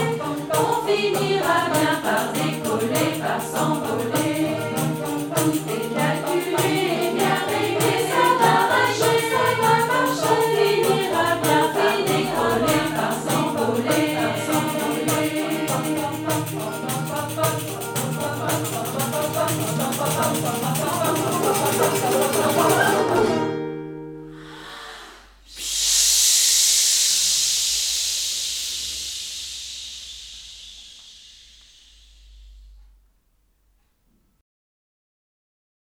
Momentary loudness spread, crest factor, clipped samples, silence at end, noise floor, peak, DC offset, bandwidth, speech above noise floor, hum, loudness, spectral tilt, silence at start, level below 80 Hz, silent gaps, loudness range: 13 LU; 18 dB; under 0.1%; 3.1 s; -64 dBFS; -4 dBFS; under 0.1%; over 20 kHz; 43 dB; none; -20 LUFS; -3 dB/octave; 0 s; -54 dBFS; none; 8 LU